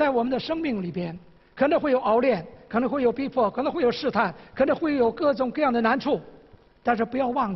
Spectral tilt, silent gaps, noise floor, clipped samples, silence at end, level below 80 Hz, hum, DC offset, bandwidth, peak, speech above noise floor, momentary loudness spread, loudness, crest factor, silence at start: -7.5 dB/octave; none; -52 dBFS; under 0.1%; 0 s; -56 dBFS; none; under 0.1%; 6 kHz; -8 dBFS; 29 dB; 8 LU; -24 LUFS; 16 dB; 0 s